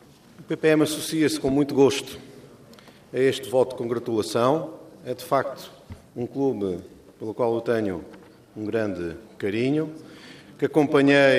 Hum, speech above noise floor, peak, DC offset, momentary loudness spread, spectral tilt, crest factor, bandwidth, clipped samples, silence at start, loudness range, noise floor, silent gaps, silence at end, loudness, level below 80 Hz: none; 26 dB; -6 dBFS; under 0.1%; 20 LU; -5.5 dB/octave; 20 dB; 15.5 kHz; under 0.1%; 0.4 s; 5 LU; -49 dBFS; none; 0 s; -24 LUFS; -60 dBFS